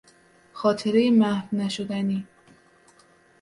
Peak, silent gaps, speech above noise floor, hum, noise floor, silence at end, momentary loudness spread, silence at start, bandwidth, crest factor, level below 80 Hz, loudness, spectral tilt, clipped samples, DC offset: -8 dBFS; none; 35 dB; none; -58 dBFS; 1.2 s; 9 LU; 0.55 s; 11.5 kHz; 18 dB; -68 dBFS; -24 LUFS; -6.5 dB/octave; under 0.1%; under 0.1%